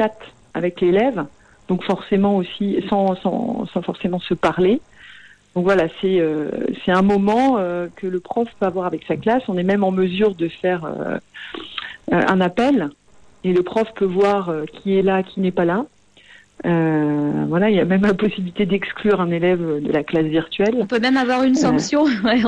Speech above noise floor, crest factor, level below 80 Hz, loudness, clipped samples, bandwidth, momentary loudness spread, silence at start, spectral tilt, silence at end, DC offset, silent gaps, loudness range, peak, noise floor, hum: 30 dB; 14 dB; -52 dBFS; -19 LUFS; under 0.1%; 9.6 kHz; 9 LU; 0 s; -6.5 dB/octave; 0 s; under 0.1%; none; 3 LU; -6 dBFS; -48 dBFS; none